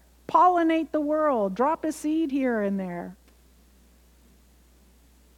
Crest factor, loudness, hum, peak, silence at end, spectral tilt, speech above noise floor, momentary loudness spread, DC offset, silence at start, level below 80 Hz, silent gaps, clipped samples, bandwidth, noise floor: 18 dB; -24 LUFS; none; -8 dBFS; 2.25 s; -6.5 dB/octave; 33 dB; 11 LU; under 0.1%; 0.3 s; -58 dBFS; none; under 0.1%; 15.5 kHz; -57 dBFS